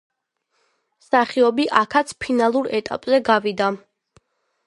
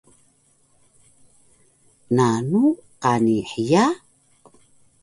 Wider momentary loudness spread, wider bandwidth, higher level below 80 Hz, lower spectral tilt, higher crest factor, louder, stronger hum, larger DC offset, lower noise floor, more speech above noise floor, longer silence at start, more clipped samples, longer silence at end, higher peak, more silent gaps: about the same, 7 LU vs 6 LU; about the same, 11.5 kHz vs 11.5 kHz; about the same, -62 dBFS vs -60 dBFS; second, -4.5 dB/octave vs -6.5 dB/octave; about the same, 20 dB vs 18 dB; about the same, -19 LUFS vs -20 LUFS; neither; neither; first, -72 dBFS vs -60 dBFS; first, 53 dB vs 42 dB; second, 1.1 s vs 2.1 s; neither; second, 0.9 s vs 1.05 s; first, 0 dBFS vs -4 dBFS; neither